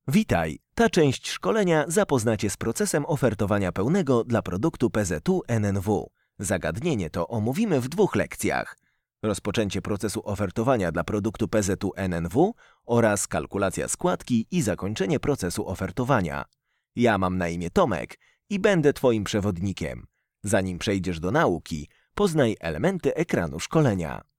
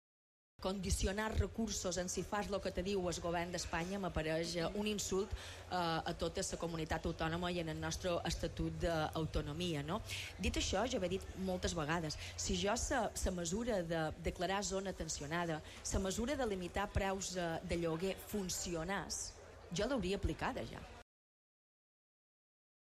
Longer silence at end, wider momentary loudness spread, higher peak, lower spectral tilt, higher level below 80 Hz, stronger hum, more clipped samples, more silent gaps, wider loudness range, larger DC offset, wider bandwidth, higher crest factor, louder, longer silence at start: second, 0.2 s vs 1.9 s; first, 8 LU vs 5 LU; first, -8 dBFS vs -22 dBFS; first, -5.5 dB/octave vs -4 dB/octave; about the same, -48 dBFS vs -50 dBFS; neither; neither; neither; about the same, 3 LU vs 2 LU; neither; about the same, 16.5 kHz vs 15 kHz; about the same, 18 dB vs 18 dB; first, -25 LUFS vs -40 LUFS; second, 0.05 s vs 0.6 s